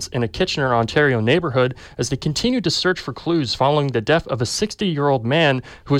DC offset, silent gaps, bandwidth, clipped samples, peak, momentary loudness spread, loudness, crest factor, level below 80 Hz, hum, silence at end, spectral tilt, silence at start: under 0.1%; none; 14.5 kHz; under 0.1%; -6 dBFS; 6 LU; -19 LUFS; 14 dB; -46 dBFS; none; 0 s; -5 dB/octave; 0 s